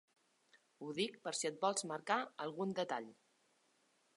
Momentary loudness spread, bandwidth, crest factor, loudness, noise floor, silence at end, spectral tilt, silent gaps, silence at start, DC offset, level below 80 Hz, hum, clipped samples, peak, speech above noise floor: 8 LU; 11.5 kHz; 22 dB; -40 LUFS; -77 dBFS; 1.05 s; -3 dB/octave; none; 0.55 s; under 0.1%; under -90 dBFS; none; under 0.1%; -20 dBFS; 36 dB